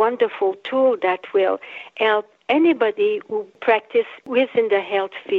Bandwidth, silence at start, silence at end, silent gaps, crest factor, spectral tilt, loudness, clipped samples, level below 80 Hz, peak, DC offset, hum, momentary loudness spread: 5 kHz; 0 s; 0 s; none; 16 dB; -6 dB/octave; -20 LUFS; under 0.1%; -72 dBFS; -4 dBFS; under 0.1%; none; 6 LU